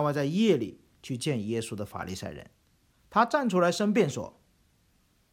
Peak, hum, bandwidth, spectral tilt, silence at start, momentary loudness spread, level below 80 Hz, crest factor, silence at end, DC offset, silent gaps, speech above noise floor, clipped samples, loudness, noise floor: -8 dBFS; none; 16 kHz; -5.5 dB/octave; 0 s; 15 LU; -64 dBFS; 20 dB; 1.05 s; under 0.1%; none; 40 dB; under 0.1%; -28 LUFS; -67 dBFS